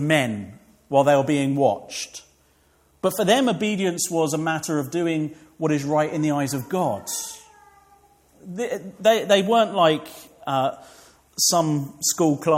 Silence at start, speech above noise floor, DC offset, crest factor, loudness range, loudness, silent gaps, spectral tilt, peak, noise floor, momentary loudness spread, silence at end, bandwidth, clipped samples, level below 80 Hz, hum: 0 s; 39 dB; under 0.1%; 18 dB; 5 LU; -22 LUFS; none; -4 dB/octave; -4 dBFS; -60 dBFS; 15 LU; 0 s; 16.5 kHz; under 0.1%; -64 dBFS; none